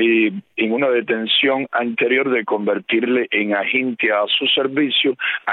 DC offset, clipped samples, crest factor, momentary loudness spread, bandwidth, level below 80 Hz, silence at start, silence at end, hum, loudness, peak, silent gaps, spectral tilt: under 0.1%; under 0.1%; 14 dB; 5 LU; 4.3 kHz; -74 dBFS; 0 s; 0 s; none; -18 LUFS; -4 dBFS; none; -8 dB/octave